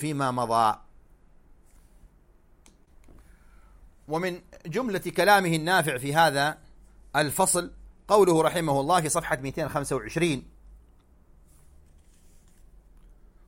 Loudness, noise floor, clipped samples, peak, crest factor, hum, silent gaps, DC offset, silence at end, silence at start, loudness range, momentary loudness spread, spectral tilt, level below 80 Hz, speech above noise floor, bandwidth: -25 LUFS; -58 dBFS; under 0.1%; -6 dBFS; 22 dB; none; none; under 0.1%; 2.7 s; 0 s; 12 LU; 12 LU; -4 dB/octave; -52 dBFS; 33 dB; 16.5 kHz